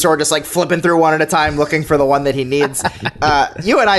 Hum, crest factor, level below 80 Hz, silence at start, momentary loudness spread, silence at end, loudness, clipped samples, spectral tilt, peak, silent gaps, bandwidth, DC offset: none; 12 dB; -40 dBFS; 0 s; 4 LU; 0 s; -15 LUFS; under 0.1%; -4 dB/octave; -2 dBFS; none; 12.5 kHz; under 0.1%